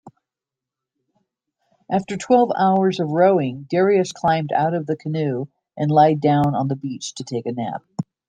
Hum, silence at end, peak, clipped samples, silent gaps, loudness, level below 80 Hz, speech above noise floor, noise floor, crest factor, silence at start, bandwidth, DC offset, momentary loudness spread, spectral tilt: none; 0.25 s; -2 dBFS; under 0.1%; none; -20 LUFS; -60 dBFS; 68 dB; -87 dBFS; 18 dB; 0.05 s; 9.6 kHz; under 0.1%; 12 LU; -6.5 dB/octave